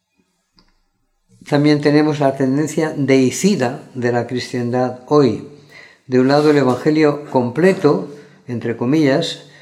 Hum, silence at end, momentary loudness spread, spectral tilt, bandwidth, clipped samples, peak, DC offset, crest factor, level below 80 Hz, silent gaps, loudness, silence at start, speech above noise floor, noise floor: none; 0.2 s; 9 LU; -6 dB/octave; 14.5 kHz; under 0.1%; 0 dBFS; under 0.1%; 16 dB; -64 dBFS; none; -16 LUFS; 1.45 s; 50 dB; -65 dBFS